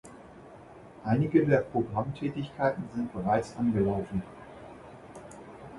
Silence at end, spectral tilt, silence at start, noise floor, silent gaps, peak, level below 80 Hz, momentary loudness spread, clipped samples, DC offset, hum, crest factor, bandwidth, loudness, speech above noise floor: 0 s; -8.5 dB/octave; 0.05 s; -50 dBFS; none; -10 dBFS; -56 dBFS; 25 LU; under 0.1%; under 0.1%; none; 20 dB; 11.5 kHz; -29 LUFS; 22 dB